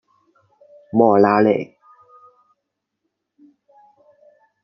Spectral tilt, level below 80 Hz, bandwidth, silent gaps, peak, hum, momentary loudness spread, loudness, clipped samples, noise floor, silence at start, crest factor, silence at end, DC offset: -9.5 dB/octave; -68 dBFS; 6 kHz; none; -2 dBFS; none; 10 LU; -16 LUFS; under 0.1%; -78 dBFS; 0.95 s; 20 dB; 3 s; under 0.1%